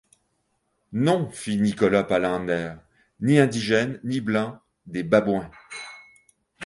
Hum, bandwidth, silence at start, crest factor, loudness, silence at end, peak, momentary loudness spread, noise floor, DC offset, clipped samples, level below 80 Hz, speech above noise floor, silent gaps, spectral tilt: none; 11.5 kHz; 0.9 s; 20 dB; -23 LUFS; 0 s; -4 dBFS; 16 LU; -72 dBFS; under 0.1%; under 0.1%; -58 dBFS; 50 dB; none; -6 dB/octave